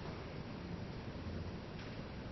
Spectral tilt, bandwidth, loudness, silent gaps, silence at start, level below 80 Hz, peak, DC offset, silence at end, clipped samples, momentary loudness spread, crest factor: -6 dB/octave; 6 kHz; -47 LUFS; none; 0 s; -56 dBFS; -34 dBFS; under 0.1%; 0 s; under 0.1%; 2 LU; 12 dB